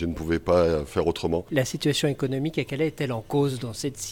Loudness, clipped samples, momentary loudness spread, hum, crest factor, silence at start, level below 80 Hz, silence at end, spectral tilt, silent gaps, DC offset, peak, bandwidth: -26 LUFS; under 0.1%; 7 LU; none; 16 dB; 0 s; -44 dBFS; 0 s; -5.5 dB/octave; none; under 0.1%; -10 dBFS; 18 kHz